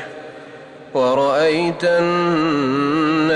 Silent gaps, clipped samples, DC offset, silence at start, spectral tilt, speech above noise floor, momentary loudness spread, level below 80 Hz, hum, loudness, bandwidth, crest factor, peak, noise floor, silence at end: none; under 0.1%; under 0.1%; 0 s; -6 dB/octave; 21 dB; 19 LU; -58 dBFS; none; -17 LUFS; 10.5 kHz; 10 dB; -8 dBFS; -38 dBFS; 0 s